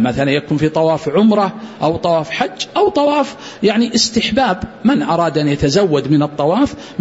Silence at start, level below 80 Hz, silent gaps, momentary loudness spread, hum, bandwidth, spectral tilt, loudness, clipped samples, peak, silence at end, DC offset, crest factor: 0 s; -42 dBFS; none; 5 LU; none; 8 kHz; -5.5 dB/octave; -15 LUFS; under 0.1%; 0 dBFS; 0 s; under 0.1%; 14 dB